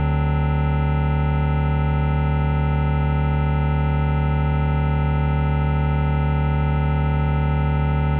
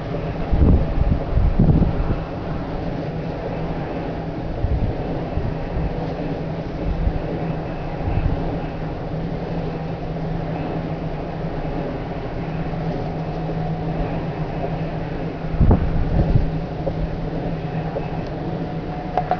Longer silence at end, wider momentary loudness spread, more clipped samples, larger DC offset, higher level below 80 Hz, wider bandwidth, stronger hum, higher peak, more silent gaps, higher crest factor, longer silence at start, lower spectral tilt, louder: about the same, 0 s vs 0 s; second, 0 LU vs 9 LU; neither; neither; about the same, -24 dBFS vs -26 dBFS; second, 4 kHz vs 5.4 kHz; neither; second, -10 dBFS vs -4 dBFS; neither; second, 10 dB vs 18 dB; about the same, 0 s vs 0 s; second, -7.5 dB/octave vs -9.5 dB/octave; first, -21 LUFS vs -24 LUFS